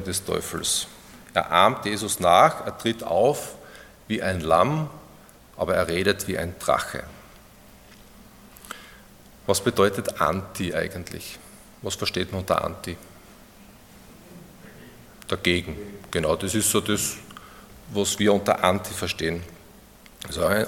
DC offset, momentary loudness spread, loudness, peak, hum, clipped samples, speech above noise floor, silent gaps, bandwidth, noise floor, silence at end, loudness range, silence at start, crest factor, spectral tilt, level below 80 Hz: under 0.1%; 20 LU; -24 LUFS; 0 dBFS; none; under 0.1%; 26 dB; none; 17.5 kHz; -50 dBFS; 0 s; 9 LU; 0 s; 24 dB; -3.5 dB/octave; -52 dBFS